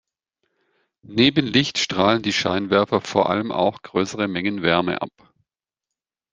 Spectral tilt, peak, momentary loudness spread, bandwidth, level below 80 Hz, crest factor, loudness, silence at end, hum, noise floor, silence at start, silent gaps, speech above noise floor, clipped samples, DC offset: -4.5 dB/octave; -2 dBFS; 7 LU; 9.8 kHz; -58 dBFS; 20 dB; -20 LUFS; 1.25 s; none; -87 dBFS; 1.1 s; none; 66 dB; under 0.1%; under 0.1%